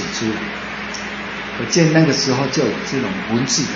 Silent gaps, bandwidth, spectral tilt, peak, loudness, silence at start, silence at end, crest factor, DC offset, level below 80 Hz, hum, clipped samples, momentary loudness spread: none; 8 kHz; -4 dB/octave; 0 dBFS; -19 LUFS; 0 s; 0 s; 18 dB; under 0.1%; -48 dBFS; none; under 0.1%; 12 LU